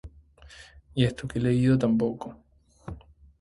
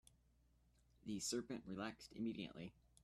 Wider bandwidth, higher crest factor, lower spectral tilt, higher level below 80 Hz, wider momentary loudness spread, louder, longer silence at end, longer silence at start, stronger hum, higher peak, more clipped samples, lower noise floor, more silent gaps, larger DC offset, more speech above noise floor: second, 11.5 kHz vs 14 kHz; about the same, 20 dB vs 18 dB; first, -7.5 dB/octave vs -4 dB/octave; first, -50 dBFS vs -74 dBFS; first, 24 LU vs 13 LU; first, -25 LUFS vs -48 LUFS; about the same, 0.4 s vs 0.35 s; second, 0.05 s vs 1.05 s; neither; first, -8 dBFS vs -32 dBFS; neither; second, -52 dBFS vs -76 dBFS; neither; neither; about the same, 27 dB vs 28 dB